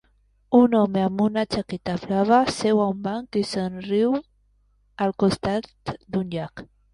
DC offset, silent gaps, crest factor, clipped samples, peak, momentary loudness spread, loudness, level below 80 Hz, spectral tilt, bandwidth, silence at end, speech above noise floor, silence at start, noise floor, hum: under 0.1%; none; 18 dB; under 0.1%; -6 dBFS; 11 LU; -23 LUFS; -54 dBFS; -6.5 dB/octave; 11.5 kHz; 0.3 s; 40 dB; 0.5 s; -63 dBFS; 50 Hz at -60 dBFS